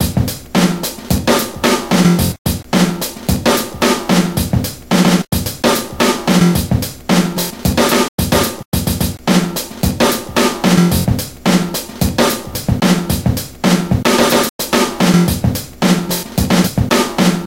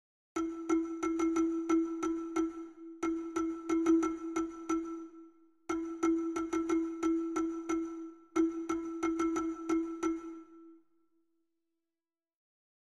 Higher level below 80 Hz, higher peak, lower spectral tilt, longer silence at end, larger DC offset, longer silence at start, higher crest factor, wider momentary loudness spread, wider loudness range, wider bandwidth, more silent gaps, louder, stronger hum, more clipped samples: first, -30 dBFS vs -66 dBFS; first, 0 dBFS vs -18 dBFS; about the same, -4.5 dB/octave vs -4.5 dB/octave; second, 0 s vs 2.15 s; neither; second, 0 s vs 0.35 s; about the same, 14 dB vs 16 dB; second, 6 LU vs 11 LU; second, 1 LU vs 4 LU; first, 17 kHz vs 11 kHz; first, 2.38-2.45 s, 8.08-8.18 s, 8.65-8.72 s, 14.49-14.59 s vs none; first, -14 LUFS vs -34 LUFS; neither; neither